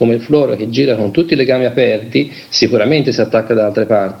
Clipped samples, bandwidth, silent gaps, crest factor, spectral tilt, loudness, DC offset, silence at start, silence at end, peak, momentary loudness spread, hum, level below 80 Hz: under 0.1%; 16 kHz; none; 12 dB; -6 dB/octave; -13 LUFS; under 0.1%; 0 s; 0 s; 0 dBFS; 3 LU; none; -52 dBFS